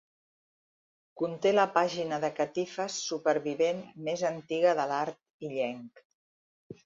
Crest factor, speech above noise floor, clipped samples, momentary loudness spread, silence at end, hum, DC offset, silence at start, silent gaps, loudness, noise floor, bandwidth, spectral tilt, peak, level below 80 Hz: 22 dB; over 60 dB; under 0.1%; 10 LU; 0.15 s; none; under 0.1%; 1.15 s; 5.30-5.39 s, 6.05-6.70 s; -30 LUFS; under -90 dBFS; 7.8 kHz; -4 dB/octave; -10 dBFS; -78 dBFS